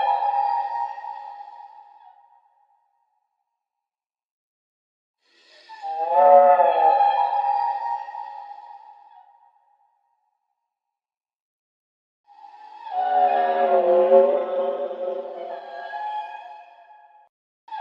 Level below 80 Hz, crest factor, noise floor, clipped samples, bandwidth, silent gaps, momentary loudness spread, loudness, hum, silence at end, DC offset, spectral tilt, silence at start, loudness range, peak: under -90 dBFS; 22 dB; under -90 dBFS; under 0.1%; 5.4 kHz; 4.31-5.14 s, 11.42-12.24 s, 17.29-17.67 s; 23 LU; -20 LUFS; none; 0 s; under 0.1%; -6 dB/octave; 0 s; 17 LU; -2 dBFS